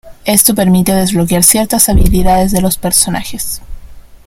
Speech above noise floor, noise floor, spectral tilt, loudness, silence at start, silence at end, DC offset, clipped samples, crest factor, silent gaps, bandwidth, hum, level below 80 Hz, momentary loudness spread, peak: 21 dB; -31 dBFS; -4 dB/octave; -10 LUFS; 0.05 s; 0.25 s; under 0.1%; 0.5%; 10 dB; none; over 20 kHz; none; -20 dBFS; 11 LU; 0 dBFS